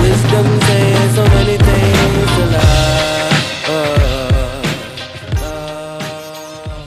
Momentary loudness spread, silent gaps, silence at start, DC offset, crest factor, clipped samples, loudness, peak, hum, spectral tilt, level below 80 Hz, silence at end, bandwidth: 14 LU; none; 0 s; under 0.1%; 12 dB; under 0.1%; -13 LUFS; 0 dBFS; none; -5.5 dB/octave; -22 dBFS; 0 s; 15 kHz